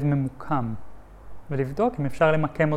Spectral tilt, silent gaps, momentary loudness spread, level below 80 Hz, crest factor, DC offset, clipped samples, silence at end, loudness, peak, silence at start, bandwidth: -8.5 dB/octave; none; 11 LU; -48 dBFS; 16 dB; under 0.1%; under 0.1%; 0 s; -25 LUFS; -8 dBFS; 0 s; 11 kHz